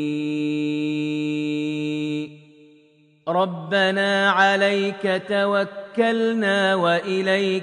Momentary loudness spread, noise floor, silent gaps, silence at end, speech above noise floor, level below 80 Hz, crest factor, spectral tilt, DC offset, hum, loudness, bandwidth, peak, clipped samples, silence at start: 8 LU; -56 dBFS; none; 0 s; 36 dB; -74 dBFS; 18 dB; -5.5 dB/octave; under 0.1%; none; -21 LUFS; 10 kHz; -4 dBFS; under 0.1%; 0 s